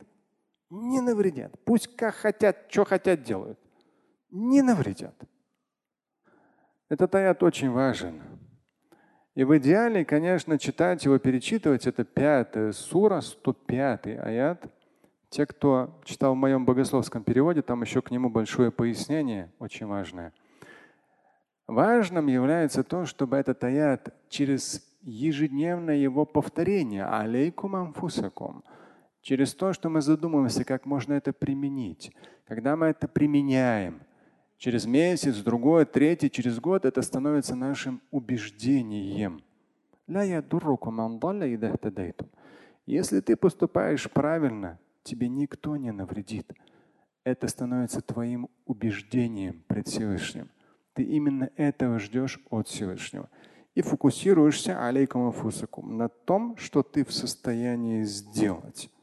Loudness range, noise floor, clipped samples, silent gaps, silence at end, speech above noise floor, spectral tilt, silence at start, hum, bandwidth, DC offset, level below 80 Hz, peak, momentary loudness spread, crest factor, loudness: 6 LU; -87 dBFS; under 0.1%; none; 0.15 s; 61 dB; -6 dB/octave; 0.7 s; none; 12.5 kHz; under 0.1%; -60 dBFS; -8 dBFS; 13 LU; 20 dB; -27 LUFS